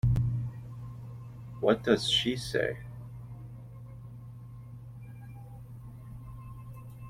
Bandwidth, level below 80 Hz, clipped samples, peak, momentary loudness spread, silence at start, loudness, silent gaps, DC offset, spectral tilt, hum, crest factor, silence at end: 15 kHz; -48 dBFS; under 0.1%; -10 dBFS; 20 LU; 0.05 s; -30 LUFS; none; under 0.1%; -5.5 dB/octave; none; 24 dB; 0 s